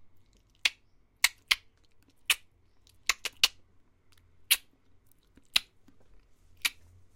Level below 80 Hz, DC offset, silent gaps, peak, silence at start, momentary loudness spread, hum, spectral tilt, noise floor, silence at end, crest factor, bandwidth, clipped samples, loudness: -64 dBFS; under 0.1%; none; -6 dBFS; 0.65 s; 6 LU; none; 2.5 dB/octave; -64 dBFS; 0.45 s; 30 dB; 16.5 kHz; under 0.1%; -29 LUFS